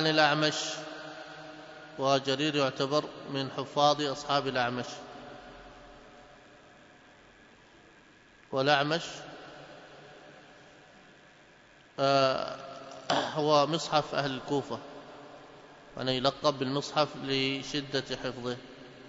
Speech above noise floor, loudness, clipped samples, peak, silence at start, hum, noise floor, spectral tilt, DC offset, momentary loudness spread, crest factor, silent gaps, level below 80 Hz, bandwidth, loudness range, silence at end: 29 dB; -30 LUFS; under 0.1%; -8 dBFS; 0 s; none; -58 dBFS; -4 dB/octave; under 0.1%; 23 LU; 24 dB; none; -66 dBFS; 8 kHz; 7 LU; 0 s